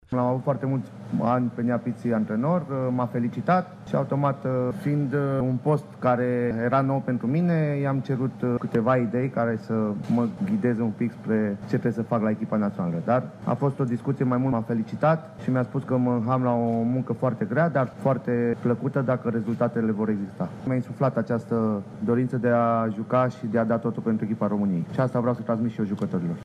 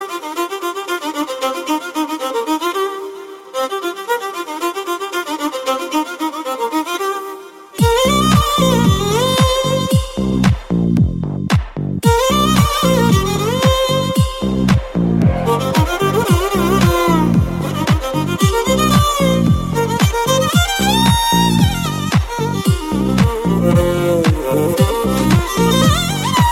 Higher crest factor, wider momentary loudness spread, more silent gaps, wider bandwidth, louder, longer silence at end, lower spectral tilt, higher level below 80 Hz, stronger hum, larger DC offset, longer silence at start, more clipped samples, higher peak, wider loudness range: about the same, 16 dB vs 14 dB; second, 4 LU vs 9 LU; neither; second, 9.8 kHz vs 16.5 kHz; second, -25 LUFS vs -15 LUFS; about the same, 0 s vs 0 s; first, -9.5 dB/octave vs -5.5 dB/octave; second, -62 dBFS vs -28 dBFS; neither; neither; about the same, 0.1 s vs 0 s; neither; second, -8 dBFS vs 0 dBFS; second, 2 LU vs 7 LU